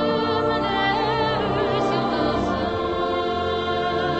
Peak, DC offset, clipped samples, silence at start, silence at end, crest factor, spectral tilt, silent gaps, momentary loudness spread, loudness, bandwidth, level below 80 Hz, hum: -10 dBFS; under 0.1%; under 0.1%; 0 s; 0 s; 12 dB; -6.5 dB/octave; none; 3 LU; -22 LUFS; 8.4 kHz; -42 dBFS; none